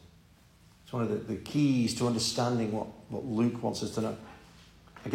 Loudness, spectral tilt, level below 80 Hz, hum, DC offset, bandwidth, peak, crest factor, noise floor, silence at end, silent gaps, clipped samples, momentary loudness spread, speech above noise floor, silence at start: -31 LUFS; -5.5 dB/octave; -62 dBFS; none; under 0.1%; 16 kHz; -14 dBFS; 18 dB; -59 dBFS; 0 s; none; under 0.1%; 12 LU; 29 dB; 0.05 s